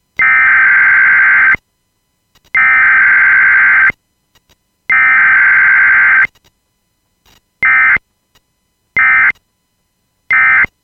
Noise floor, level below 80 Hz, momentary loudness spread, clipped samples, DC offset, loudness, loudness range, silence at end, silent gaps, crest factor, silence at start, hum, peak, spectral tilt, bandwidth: -63 dBFS; -48 dBFS; 8 LU; under 0.1%; under 0.1%; -7 LUFS; 5 LU; 0.15 s; none; 10 dB; 0.2 s; none; -2 dBFS; -3.5 dB/octave; 6.2 kHz